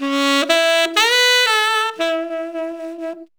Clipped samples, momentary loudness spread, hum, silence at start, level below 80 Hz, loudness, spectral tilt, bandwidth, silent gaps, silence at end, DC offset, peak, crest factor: under 0.1%; 16 LU; none; 0 s; -66 dBFS; -15 LUFS; 1 dB/octave; over 20 kHz; none; 0.15 s; under 0.1%; 0 dBFS; 18 dB